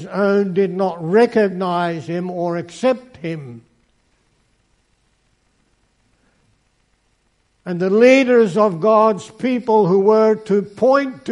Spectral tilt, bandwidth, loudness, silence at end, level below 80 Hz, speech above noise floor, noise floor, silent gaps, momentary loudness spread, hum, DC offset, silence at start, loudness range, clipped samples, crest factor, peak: -7 dB/octave; 10.5 kHz; -16 LUFS; 0 s; -64 dBFS; 47 dB; -63 dBFS; none; 12 LU; none; under 0.1%; 0 s; 13 LU; under 0.1%; 18 dB; 0 dBFS